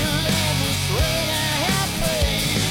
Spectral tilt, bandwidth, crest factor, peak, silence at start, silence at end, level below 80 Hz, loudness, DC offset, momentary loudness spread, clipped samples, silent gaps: -3.5 dB/octave; 16.5 kHz; 14 dB; -8 dBFS; 0 s; 0 s; -30 dBFS; -20 LUFS; under 0.1%; 1 LU; under 0.1%; none